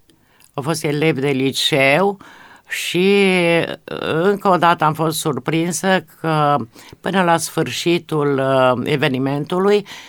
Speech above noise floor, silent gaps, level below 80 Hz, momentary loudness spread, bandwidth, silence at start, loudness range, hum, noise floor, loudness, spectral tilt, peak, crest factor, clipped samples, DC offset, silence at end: 35 dB; none; -60 dBFS; 9 LU; 19.5 kHz; 0.55 s; 2 LU; none; -53 dBFS; -17 LUFS; -5 dB/octave; 0 dBFS; 16 dB; under 0.1%; under 0.1%; 0 s